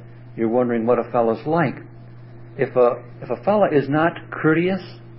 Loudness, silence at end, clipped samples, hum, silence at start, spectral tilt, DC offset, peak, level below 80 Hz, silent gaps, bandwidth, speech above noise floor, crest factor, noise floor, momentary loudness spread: -20 LUFS; 0 s; under 0.1%; none; 0 s; -12 dB/octave; under 0.1%; -4 dBFS; -58 dBFS; none; 5.8 kHz; 20 dB; 16 dB; -40 dBFS; 12 LU